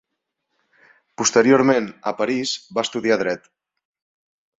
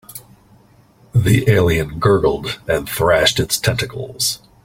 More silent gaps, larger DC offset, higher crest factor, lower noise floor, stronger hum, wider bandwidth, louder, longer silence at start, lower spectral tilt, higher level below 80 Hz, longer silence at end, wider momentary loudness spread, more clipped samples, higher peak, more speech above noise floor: neither; neither; about the same, 20 dB vs 18 dB; first, -78 dBFS vs -50 dBFS; neither; second, 8 kHz vs 16.5 kHz; about the same, -19 LUFS vs -17 LUFS; first, 1.2 s vs 0.1 s; about the same, -3.5 dB/octave vs -4.5 dB/octave; second, -66 dBFS vs -38 dBFS; first, 1.2 s vs 0.3 s; about the same, 11 LU vs 10 LU; neither; about the same, -2 dBFS vs 0 dBFS; first, 59 dB vs 34 dB